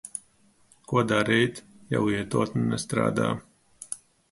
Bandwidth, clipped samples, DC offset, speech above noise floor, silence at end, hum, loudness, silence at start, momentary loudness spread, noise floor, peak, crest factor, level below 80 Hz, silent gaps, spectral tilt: 11.5 kHz; under 0.1%; under 0.1%; 37 dB; 0.35 s; none; -26 LUFS; 0.05 s; 16 LU; -62 dBFS; -8 dBFS; 20 dB; -58 dBFS; none; -5.5 dB/octave